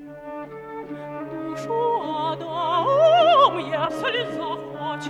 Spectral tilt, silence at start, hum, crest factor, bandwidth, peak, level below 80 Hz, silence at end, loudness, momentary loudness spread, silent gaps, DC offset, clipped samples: -5 dB/octave; 0 s; none; 18 dB; 11.5 kHz; -4 dBFS; -62 dBFS; 0 s; -21 LUFS; 20 LU; none; under 0.1%; under 0.1%